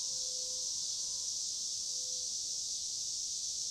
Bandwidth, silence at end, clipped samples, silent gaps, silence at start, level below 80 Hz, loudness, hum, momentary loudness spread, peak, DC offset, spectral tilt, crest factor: 16 kHz; 0 s; under 0.1%; none; 0 s; -72 dBFS; -35 LUFS; none; 1 LU; -24 dBFS; under 0.1%; 2 dB/octave; 14 dB